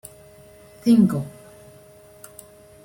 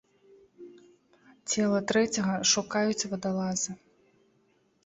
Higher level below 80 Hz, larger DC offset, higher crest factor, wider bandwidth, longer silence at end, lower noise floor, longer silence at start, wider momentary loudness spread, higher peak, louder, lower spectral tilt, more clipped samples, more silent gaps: first, -60 dBFS vs -68 dBFS; neither; about the same, 18 dB vs 20 dB; first, 16.5 kHz vs 8.2 kHz; first, 1.55 s vs 1.1 s; second, -48 dBFS vs -68 dBFS; first, 0.85 s vs 0.6 s; first, 26 LU vs 9 LU; first, -6 dBFS vs -10 dBFS; first, -19 LUFS vs -28 LUFS; first, -7.5 dB/octave vs -3.5 dB/octave; neither; neither